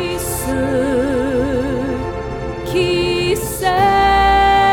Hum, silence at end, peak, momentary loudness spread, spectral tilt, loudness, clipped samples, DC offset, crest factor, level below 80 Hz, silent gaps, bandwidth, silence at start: none; 0 s; -2 dBFS; 11 LU; -4.5 dB/octave; -16 LUFS; under 0.1%; under 0.1%; 14 dB; -30 dBFS; none; over 20 kHz; 0 s